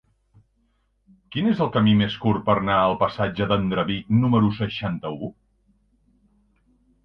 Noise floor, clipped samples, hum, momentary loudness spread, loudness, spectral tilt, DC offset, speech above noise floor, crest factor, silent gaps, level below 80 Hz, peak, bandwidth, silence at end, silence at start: -67 dBFS; under 0.1%; none; 11 LU; -22 LUFS; -9 dB/octave; under 0.1%; 46 dB; 18 dB; none; -50 dBFS; -4 dBFS; 5.6 kHz; 1.75 s; 1.3 s